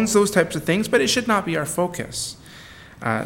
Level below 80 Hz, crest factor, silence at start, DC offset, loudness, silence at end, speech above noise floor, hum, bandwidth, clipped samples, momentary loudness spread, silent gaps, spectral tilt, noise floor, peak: -52 dBFS; 18 dB; 0 s; under 0.1%; -21 LUFS; 0 s; 22 dB; none; 17.5 kHz; under 0.1%; 15 LU; none; -4 dB/octave; -43 dBFS; -4 dBFS